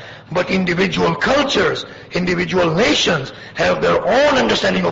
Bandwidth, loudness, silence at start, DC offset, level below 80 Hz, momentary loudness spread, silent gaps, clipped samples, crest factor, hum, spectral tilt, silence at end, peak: 8 kHz; -16 LUFS; 0 s; under 0.1%; -42 dBFS; 8 LU; none; under 0.1%; 12 dB; none; -4.5 dB/octave; 0 s; -4 dBFS